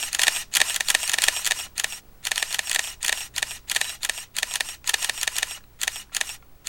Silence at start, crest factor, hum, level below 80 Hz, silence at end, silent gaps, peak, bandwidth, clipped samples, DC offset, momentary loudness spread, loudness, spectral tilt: 0 s; 26 dB; none; -54 dBFS; 0 s; none; 0 dBFS; 17.5 kHz; under 0.1%; 0.2%; 8 LU; -24 LUFS; 2.5 dB/octave